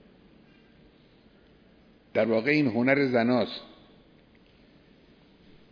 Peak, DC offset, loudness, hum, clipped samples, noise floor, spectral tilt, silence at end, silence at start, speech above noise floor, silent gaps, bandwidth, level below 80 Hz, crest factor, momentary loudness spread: -6 dBFS; under 0.1%; -25 LUFS; none; under 0.1%; -58 dBFS; -8 dB/octave; 2.05 s; 2.15 s; 34 dB; none; 5.4 kHz; -68 dBFS; 24 dB; 9 LU